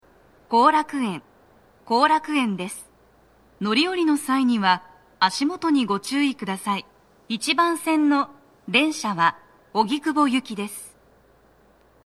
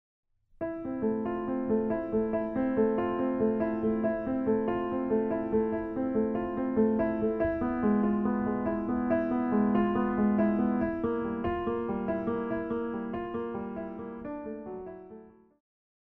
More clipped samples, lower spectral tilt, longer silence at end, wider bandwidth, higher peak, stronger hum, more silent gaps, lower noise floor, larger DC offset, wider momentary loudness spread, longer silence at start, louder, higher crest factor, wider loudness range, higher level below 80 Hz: neither; second, -4 dB/octave vs -11 dB/octave; first, 1.15 s vs 0.85 s; first, 14 kHz vs 3.4 kHz; first, -4 dBFS vs -14 dBFS; neither; neither; first, -57 dBFS vs -51 dBFS; neither; about the same, 12 LU vs 11 LU; about the same, 0.5 s vs 0.6 s; first, -22 LUFS vs -30 LUFS; first, 20 dB vs 14 dB; second, 2 LU vs 6 LU; second, -66 dBFS vs -52 dBFS